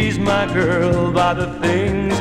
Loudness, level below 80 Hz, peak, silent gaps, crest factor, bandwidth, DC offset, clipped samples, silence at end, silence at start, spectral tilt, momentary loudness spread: -17 LUFS; -34 dBFS; -2 dBFS; none; 16 dB; 13.5 kHz; under 0.1%; under 0.1%; 0 s; 0 s; -6 dB/octave; 2 LU